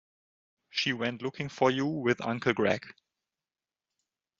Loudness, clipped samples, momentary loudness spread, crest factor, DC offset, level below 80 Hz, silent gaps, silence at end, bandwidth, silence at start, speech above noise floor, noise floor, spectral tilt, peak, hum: -30 LUFS; under 0.1%; 8 LU; 24 dB; under 0.1%; -70 dBFS; none; 1.5 s; 7.6 kHz; 0.75 s; over 60 dB; under -90 dBFS; -3.5 dB/octave; -8 dBFS; none